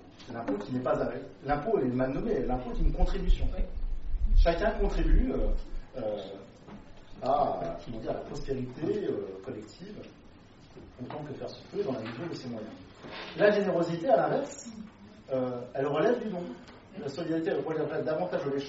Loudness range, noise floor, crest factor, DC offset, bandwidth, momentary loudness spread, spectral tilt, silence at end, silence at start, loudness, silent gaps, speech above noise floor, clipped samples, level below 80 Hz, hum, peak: 8 LU; -53 dBFS; 20 dB; under 0.1%; 7.6 kHz; 18 LU; -5.5 dB/octave; 0 s; 0 s; -32 LUFS; none; 24 dB; under 0.1%; -34 dBFS; none; -10 dBFS